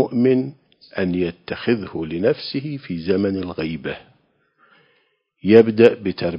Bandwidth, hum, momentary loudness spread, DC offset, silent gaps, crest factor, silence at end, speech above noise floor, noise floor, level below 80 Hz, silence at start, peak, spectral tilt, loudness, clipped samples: 5.4 kHz; none; 15 LU; under 0.1%; none; 20 dB; 0 s; 46 dB; -65 dBFS; -50 dBFS; 0 s; 0 dBFS; -9 dB/octave; -19 LUFS; under 0.1%